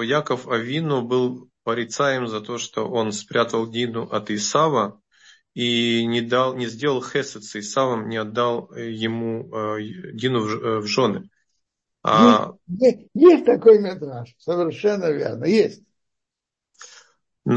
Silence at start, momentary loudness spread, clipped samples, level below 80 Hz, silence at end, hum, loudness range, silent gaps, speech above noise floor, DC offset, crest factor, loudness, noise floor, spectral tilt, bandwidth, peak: 0 s; 14 LU; under 0.1%; -68 dBFS; 0 s; none; 8 LU; none; 66 dB; under 0.1%; 22 dB; -21 LUFS; -86 dBFS; -5 dB/octave; 8.4 kHz; 0 dBFS